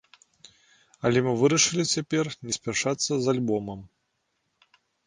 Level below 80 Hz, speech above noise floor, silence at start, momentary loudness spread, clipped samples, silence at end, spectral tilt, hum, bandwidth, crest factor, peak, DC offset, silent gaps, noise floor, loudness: -62 dBFS; 51 dB; 1.05 s; 10 LU; under 0.1%; 1.2 s; -3.5 dB/octave; none; 10.5 kHz; 20 dB; -8 dBFS; under 0.1%; none; -76 dBFS; -25 LUFS